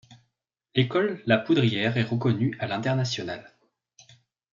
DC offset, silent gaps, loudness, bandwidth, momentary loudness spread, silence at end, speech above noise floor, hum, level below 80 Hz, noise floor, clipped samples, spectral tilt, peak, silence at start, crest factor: under 0.1%; none; -25 LUFS; 7.4 kHz; 8 LU; 1.1 s; 55 dB; none; -68 dBFS; -79 dBFS; under 0.1%; -6.5 dB/octave; -6 dBFS; 0.1 s; 20 dB